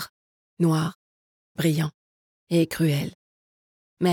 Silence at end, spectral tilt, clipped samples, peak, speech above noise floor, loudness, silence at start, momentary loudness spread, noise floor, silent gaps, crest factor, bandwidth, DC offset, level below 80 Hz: 0 s; -6.5 dB/octave; under 0.1%; -10 dBFS; over 67 dB; -25 LUFS; 0 s; 11 LU; under -90 dBFS; 0.09-0.57 s, 0.95-1.55 s, 1.94-2.47 s, 3.15-3.97 s; 16 dB; 19 kHz; under 0.1%; -64 dBFS